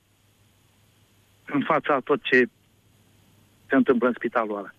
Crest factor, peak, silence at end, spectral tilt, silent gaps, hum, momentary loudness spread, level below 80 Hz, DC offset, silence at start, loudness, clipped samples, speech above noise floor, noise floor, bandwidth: 18 dB; -8 dBFS; 0.1 s; -6.5 dB/octave; none; none; 8 LU; -70 dBFS; under 0.1%; 1.5 s; -23 LUFS; under 0.1%; 39 dB; -62 dBFS; 7.2 kHz